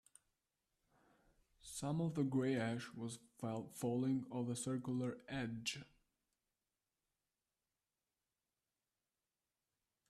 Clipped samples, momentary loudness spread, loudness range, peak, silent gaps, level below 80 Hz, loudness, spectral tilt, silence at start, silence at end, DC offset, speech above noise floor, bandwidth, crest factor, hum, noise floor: under 0.1%; 10 LU; 9 LU; -28 dBFS; none; -76 dBFS; -42 LUFS; -5.5 dB/octave; 1.65 s; 4.25 s; under 0.1%; over 48 dB; 13.5 kHz; 18 dB; none; under -90 dBFS